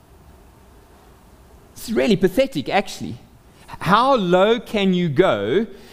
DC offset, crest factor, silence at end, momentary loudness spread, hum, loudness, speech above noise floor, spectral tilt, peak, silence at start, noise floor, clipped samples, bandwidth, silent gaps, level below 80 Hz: under 0.1%; 20 dB; 0.15 s; 15 LU; none; -19 LUFS; 30 dB; -6 dB/octave; -2 dBFS; 1.75 s; -48 dBFS; under 0.1%; 16 kHz; none; -46 dBFS